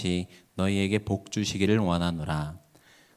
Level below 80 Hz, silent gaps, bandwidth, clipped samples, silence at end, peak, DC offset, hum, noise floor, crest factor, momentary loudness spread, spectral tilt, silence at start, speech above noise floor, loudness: -46 dBFS; none; 15 kHz; under 0.1%; 0.6 s; -10 dBFS; under 0.1%; none; -58 dBFS; 18 dB; 8 LU; -5.5 dB/octave; 0 s; 31 dB; -28 LUFS